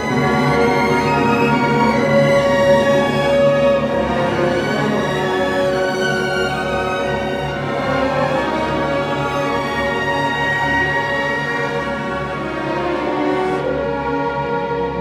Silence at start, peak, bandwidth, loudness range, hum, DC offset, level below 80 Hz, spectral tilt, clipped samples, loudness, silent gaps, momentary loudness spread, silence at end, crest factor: 0 s; -2 dBFS; 15.5 kHz; 5 LU; none; under 0.1%; -40 dBFS; -6 dB/octave; under 0.1%; -17 LUFS; none; 7 LU; 0 s; 14 dB